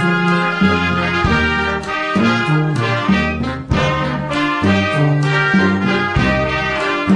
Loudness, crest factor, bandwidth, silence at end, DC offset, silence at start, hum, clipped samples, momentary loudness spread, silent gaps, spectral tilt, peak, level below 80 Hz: -15 LUFS; 12 dB; 10.5 kHz; 0 s; 0.2%; 0 s; none; under 0.1%; 4 LU; none; -6.5 dB/octave; -2 dBFS; -32 dBFS